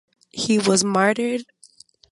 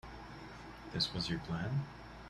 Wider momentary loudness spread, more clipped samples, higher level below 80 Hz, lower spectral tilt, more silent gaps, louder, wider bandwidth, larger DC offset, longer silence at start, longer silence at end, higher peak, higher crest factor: second, 12 LU vs 15 LU; neither; second, -64 dBFS vs -56 dBFS; second, -3.5 dB/octave vs -5 dB/octave; neither; first, -20 LUFS vs -38 LUFS; second, 11.5 kHz vs 13 kHz; neither; first, 0.35 s vs 0.05 s; first, 0.7 s vs 0 s; first, -4 dBFS vs -22 dBFS; about the same, 18 dB vs 20 dB